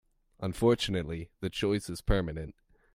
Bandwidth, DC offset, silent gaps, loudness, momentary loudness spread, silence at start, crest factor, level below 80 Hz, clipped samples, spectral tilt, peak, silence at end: 16 kHz; under 0.1%; none; -31 LUFS; 12 LU; 0.4 s; 20 dB; -42 dBFS; under 0.1%; -6 dB/octave; -12 dBFS; 0.45 s